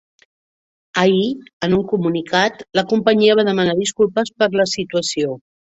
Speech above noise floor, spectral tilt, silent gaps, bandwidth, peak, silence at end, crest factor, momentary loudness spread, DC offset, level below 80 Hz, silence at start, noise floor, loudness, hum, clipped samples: over 73 dB; -4.5 dB/octave; 1.53-1.60 s; 8 kHz; -2 dBFS; 0.4 s; 16 dB; 9 LU; under 0.1%; -56 dBFS; 0.95 s; under -90 dBFS; -17 LUFS; none; under 0.1%